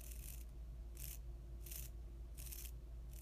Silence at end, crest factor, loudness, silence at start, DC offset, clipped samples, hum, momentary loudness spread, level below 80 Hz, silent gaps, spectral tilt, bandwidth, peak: 0 s; 20 dB; -52 LUFS; 0 s; under 0.1%; under 0.1%; none; 4 LU; -52 dBFS; none; -3.5 dB/octave; 15.5 kHz; -32 dBFS